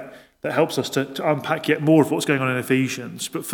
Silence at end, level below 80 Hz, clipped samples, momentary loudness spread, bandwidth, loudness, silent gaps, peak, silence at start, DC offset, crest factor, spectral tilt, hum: 0 s; -68 dBFS; under 0.1%; 11 LU; 19 kHz; -21 LUFS; none; -2 dBFS; 0 s; under 0.1%; 18 dB; -5 dB/octave; none